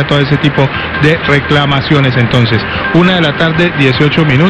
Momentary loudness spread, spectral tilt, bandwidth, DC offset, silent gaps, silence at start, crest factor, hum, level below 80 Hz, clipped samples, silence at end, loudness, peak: 3 LU; -7 dB/octave; 8.8 kHz; under 0.1%; none; 0 s; 10 dB; none; -32 dBFS; 0.4%; 0 s; -9 LUFS; 0 dBFS